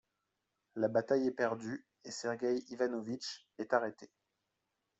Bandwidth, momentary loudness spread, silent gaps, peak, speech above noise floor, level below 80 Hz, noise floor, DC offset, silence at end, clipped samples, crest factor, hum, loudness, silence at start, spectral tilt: 8.2 kHz; 13 LU; none; -16 dBFS; 50 dB; -82 dBFS; -86 dBFS; under 0.1%; 0.95 s; under 0.1%; 22 dB; none; -37 LUFS; 0.75 s; -5 dB/octave